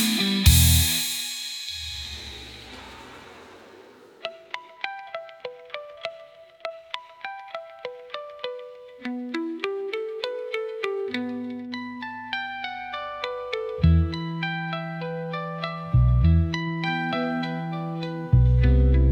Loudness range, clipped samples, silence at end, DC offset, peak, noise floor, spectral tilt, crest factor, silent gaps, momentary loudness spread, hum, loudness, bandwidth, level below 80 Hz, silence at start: 14 LU; under 0.1%; 0 s; under 0.1%; -4 dBFS; -49 dBFS; -4.5 dB/octave; 22 dB; none; 19 LU; none; -25 LUFS; 19 kHz; -32 dBFS; 0 s